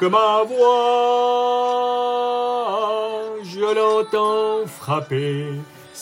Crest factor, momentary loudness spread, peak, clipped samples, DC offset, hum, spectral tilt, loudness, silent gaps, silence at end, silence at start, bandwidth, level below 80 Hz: 14 dB; 10 LU; -6 dBFS; under 0.1%; under 0.1%; none; -5.5 dB/octave; -19 LUFS; none; 0 s; 0 s; 16 kHz; -72 dBFS